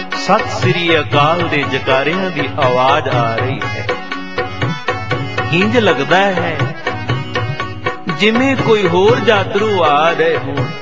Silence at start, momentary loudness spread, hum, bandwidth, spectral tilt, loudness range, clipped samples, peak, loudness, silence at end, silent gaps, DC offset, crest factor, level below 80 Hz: 0 s; 9 LU; none; 7.8 kHz; -6 dB/octave; 3 LU; under 0.1%; 0 dBFS; -14 LUFS; 0 s; none; 3%; 14 dB; -44 dBFS